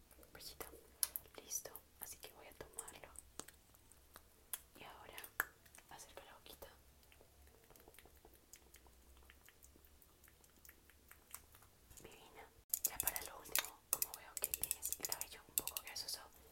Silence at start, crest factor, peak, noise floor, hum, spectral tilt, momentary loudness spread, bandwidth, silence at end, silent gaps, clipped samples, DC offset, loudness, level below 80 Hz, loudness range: 0 s; 36 dB; -14 dBFS; -67 dBFS; none; 0 dB/octave; 25 LU; 17 kHz; 0 s; 12.64-12.69 s; under 0.1%; under 0.1%; -44 LUFS; -70 dBFS; 22 LU